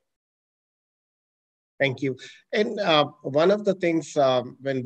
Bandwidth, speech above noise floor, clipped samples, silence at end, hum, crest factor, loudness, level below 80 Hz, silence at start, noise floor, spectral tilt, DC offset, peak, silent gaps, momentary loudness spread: 9 kHz; over 66 dB; under 0.1%; 0 s; none; 20 dB; -24 LUFS; -76 dBFS; 1.8 s; under -90 dBFS; -5.5 dB/octave; under 0.1%; -6 dBFS; none; 9 LU